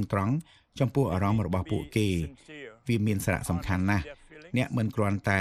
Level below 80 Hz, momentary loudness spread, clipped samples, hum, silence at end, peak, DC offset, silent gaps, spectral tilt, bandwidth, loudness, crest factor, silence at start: -48 dBFS; 14 LU; under 0.1%; none; 0 s; -10 dBFS; under 0.1%; none; -6.5 dB/octave; 15 kHz; -29 LUFS; 18 dB; 0 s